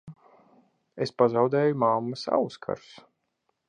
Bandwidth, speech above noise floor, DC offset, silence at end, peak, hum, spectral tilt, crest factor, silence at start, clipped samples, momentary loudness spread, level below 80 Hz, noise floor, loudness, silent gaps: 9.8 kHz; 51 dB; under 0.1%; 0.9 s; -6 dBFS; none; -7 dB/octave; 20 dB; 0.05 s; under 0.1%; 13 LU; -72 dBFS; -77 dBFS; -26 LUFS; none